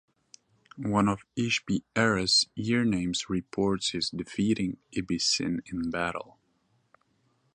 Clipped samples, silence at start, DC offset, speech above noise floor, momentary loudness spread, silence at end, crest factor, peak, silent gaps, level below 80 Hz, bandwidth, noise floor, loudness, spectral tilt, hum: under 0.1%; 0.75 s; under 0.1%; 43 dB; 9 LU; 1.3 s; 22 dB; -8 dBFS; none; -56 dBFS; 11 kHz; -71 dBFS; -28 LUFS; -4 dB/octave; none